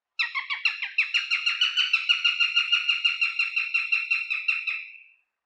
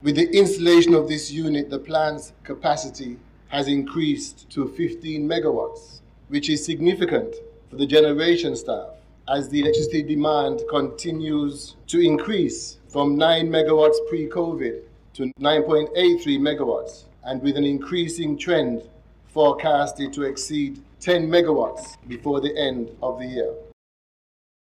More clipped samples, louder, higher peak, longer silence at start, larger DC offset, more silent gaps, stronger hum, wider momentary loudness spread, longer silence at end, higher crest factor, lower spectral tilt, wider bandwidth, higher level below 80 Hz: neither; about the same, -23 LUFS vs -22 LUFS; about the same, -8 dBFS vs -6 dBFS; first, 0.2 s vs 0 s; neither; neither; neither; second, 7 LU vs 14 LU; second, 0.45 s vs 0.9 s; about the same, 18 dB vs 16 dB; second, 8 dB/octave vs -5 dB/octave; second, 9.6 kHz vs 11.5 kHz; second, under -90 dBFS vs -52 dBFS